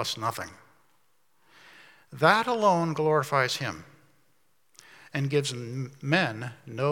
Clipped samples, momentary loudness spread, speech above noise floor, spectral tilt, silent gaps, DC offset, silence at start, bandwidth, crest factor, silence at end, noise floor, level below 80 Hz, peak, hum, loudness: under 0.1%; 16 LU; 45 dB; -5 dB/octave; none; under 0.1%; 0 s; 18 kHz; 24 dB; 0 s; -71 dBFS; -74 dBFS; -4 dBFS; none; -27 LUFS